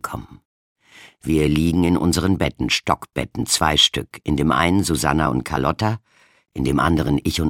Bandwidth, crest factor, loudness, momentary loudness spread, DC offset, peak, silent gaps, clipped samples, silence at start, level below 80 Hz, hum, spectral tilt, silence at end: 17 kHz; 20 dB; -19 LUFS; 10 LU; under 0.1%; 0 dBFS; 0.45-0.76 s; under 0.1%; 0.05 s; -36 dBFS; none; -4.5 dB/octave; 0 s